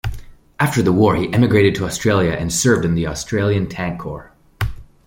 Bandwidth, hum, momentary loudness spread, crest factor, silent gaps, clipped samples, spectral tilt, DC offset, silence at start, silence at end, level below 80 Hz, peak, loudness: 16.5 kHz; none; 12 LU; 16 dB; none; under 0.1%; -5.5 dB/octave; under 0.1%; 0.05 s; 0.2 s; -36 dBFS; -2 dBFS; -17 LUFS